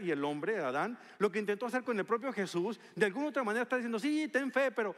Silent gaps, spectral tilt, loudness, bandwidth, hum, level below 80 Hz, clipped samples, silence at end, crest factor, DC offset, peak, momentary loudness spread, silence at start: none; -5 dB/octave; -34 LUFS; 13.5 kHz; none; -88 dBFS; under 0.1%; 0 s; 18 dB; under 0.1%; -16 dBFS; 4 LU; 0 s